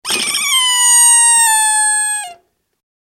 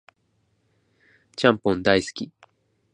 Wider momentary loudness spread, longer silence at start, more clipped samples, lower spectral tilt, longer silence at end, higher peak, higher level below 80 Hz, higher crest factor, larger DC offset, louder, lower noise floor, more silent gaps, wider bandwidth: second, 11 LU vs 17 LU; second, 0.05 s vs 1.4 s; neither; second, 3.5 dB/octave vs -5 dB/octave; about the same, 0.7 s vs 0.7 s; about the same, 0 dBFS vs -2 dBFS; second, -64 dBFS vs -56 dBFS; second, 12 dB vs 24 dB; neither; first, -9 LUFS vs -22 LUFS; second, -45 dBFS vs -69 dBFS; neither; first, 16.5 kHz vs 10.5 kHz